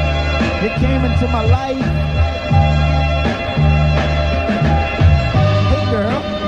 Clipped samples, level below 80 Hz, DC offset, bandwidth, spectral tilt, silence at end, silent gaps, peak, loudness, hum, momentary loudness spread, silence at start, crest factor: under 0.1%; -20 dBFS; under 0.1%; 7.8 kHz; -7.5 dB/octave; 0 s; none; 0 dBFS; -15 LUFS; none; 4 LU; 0 s; 14 dB